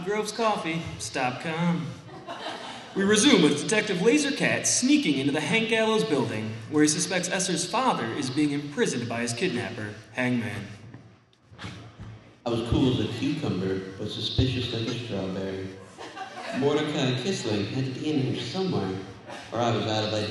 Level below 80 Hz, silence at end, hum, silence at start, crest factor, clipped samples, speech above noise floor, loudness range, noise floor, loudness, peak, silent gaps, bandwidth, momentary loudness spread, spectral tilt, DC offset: -50 dBFS; 0 s; none; 0 s; 22 dB; under 0.1%; 29 dB; 8 LU; -55 dBFS; -26 LUFS; -4 dBFS; none; 12.5 kHz; 16 LU; -4 dB/octave; under 0.1%